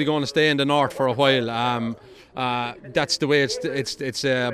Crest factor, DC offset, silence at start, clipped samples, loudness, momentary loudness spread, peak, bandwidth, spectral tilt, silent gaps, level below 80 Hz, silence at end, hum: 18 dB; under 0.1%; 0 s; under 0.1%; -22 LUFS; 8 LU; -4 dBFS; 14.5 kHz; -4.5 dB/octave; none; -58 dBFS; 0 s; none